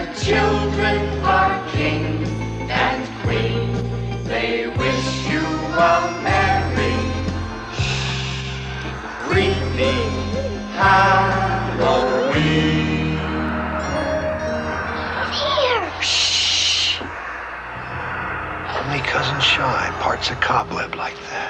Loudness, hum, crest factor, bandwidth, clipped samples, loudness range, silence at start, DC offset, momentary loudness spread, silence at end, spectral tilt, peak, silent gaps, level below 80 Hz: -20 LUFS; none; 16 dB; 9.6 kHz; under 0.1%; 4 LU; 0 s; under 0.1%; 11 LU; 0 s; -4.5 dB/octave; -4 dBFS; none; -34 dBFS